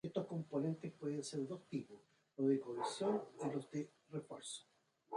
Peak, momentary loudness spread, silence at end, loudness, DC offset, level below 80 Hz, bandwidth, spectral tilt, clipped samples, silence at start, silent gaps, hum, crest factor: -24 dBFS; 12 LU; 0 s; -43 LUFS; under 0.1%; -86 dBFS; 11 kHz; -6 dB/octave; under 0.1%; 0.05 s; none; none; 18 dB